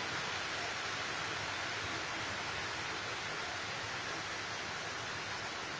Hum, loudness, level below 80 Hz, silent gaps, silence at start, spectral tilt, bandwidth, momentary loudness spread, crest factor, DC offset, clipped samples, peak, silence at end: none; -38 LUFS; -64 dBFS; none; 0 s; -2 dB/octave; 8 kHz; 2 LU; 14 dB; under 0.1%; under 0.1%; -26 dBFS; 0 s